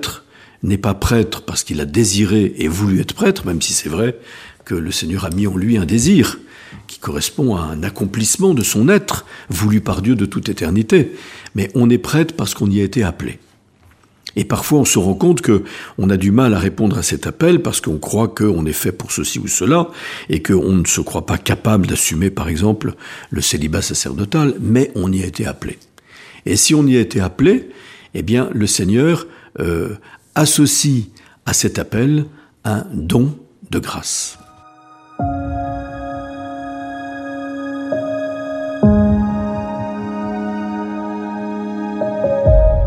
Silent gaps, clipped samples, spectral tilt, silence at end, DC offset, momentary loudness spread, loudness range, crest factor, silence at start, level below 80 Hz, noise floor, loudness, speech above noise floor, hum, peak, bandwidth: none; under 0.1%; -5 dB/octave; 0 s; under 0.1%; 14 LU; 6 LU; 16 dB; 0 s; -32 dBFS; -50 dBFS; -17 LUFS; 35 dB; none; 0 dBFS; 15.5 kHz